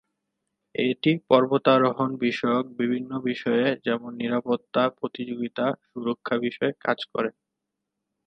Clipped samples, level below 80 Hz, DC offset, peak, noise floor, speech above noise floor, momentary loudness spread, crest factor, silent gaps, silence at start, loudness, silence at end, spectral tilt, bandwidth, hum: under 0.1%; -72 dBFS; under 0.1%; -4 dBFS; -83 dBFS; 59 dB; 11 LU; 22 dB; none; 0.8 s; -25 LUFS; 0.95 s; -7.5 dB/octave; 6.4 kHz; none